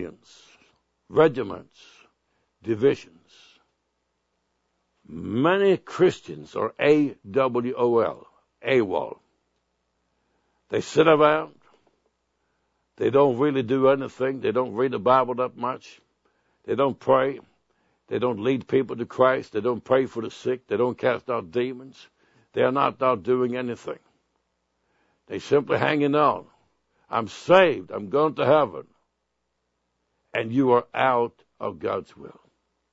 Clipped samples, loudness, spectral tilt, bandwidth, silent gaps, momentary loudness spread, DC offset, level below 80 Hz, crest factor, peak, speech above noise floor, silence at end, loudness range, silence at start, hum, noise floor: under 0.1%; -23 LUFS; -6.5 dB/octave; 8 kHz; none; 14 LU; under 0.1%; -68 dBFS; 22 dB; -2 dBFS; 54 dB; 0.65 s; 4 LU; 0 s; none; -77 dBFS